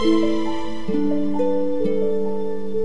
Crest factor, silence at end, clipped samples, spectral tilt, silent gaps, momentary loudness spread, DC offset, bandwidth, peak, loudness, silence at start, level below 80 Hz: 14 dB; 0 s; under 0.1%; -7 dB/octave; none; 7 LU; 9%; 10.5 kHz; -6 dBFS; -23 LUFS; 0 s; -48 dBFS